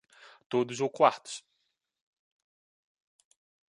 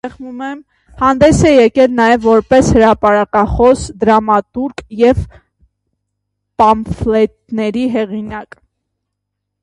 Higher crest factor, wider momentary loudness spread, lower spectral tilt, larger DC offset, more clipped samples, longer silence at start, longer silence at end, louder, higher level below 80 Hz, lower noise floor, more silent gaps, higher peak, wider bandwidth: first, 26 dB vs 12 dB; about the same, 17 LU vs 16 LU; second, -4.5 dB/octave vs -6 dB/octave; neither; neither; first, 0.5 s vs 0.05 s; first, 2.35 s vs 1.2 s; second, -28 LUFS vs -12 LUFS; second, -84 dBFS vs -32 dBFS; first, -80 dBFS vs -75 dBFS; neither; second, -8 dBFS vs 0 dBFS; about the same, 11.5 kHz vs 11.5 kHz